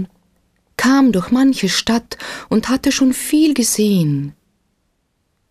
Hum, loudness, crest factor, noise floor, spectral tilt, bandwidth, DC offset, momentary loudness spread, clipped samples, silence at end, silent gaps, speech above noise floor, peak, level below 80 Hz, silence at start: none; -15 LUFS; 12 dB; -67 dBFS; -4.5 dB/octave; 15.5 kHz; under 0.1%; 15 LU; under 0.1%; 1.2 s; none; 52 dB; -4 dBFS; -48 dBFS; 0 s